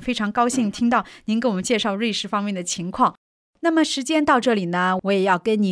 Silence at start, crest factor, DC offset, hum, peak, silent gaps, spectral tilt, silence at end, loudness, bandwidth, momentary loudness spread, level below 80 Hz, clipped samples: 0 s; 16 dB; under 0.1%; none; -6 dBFS; 3.17-3.53 s; -4.5 dB/octave; 0 s; -21 LUFS; 11 kHz; 6 LU; -56 dBFS; under 0.1%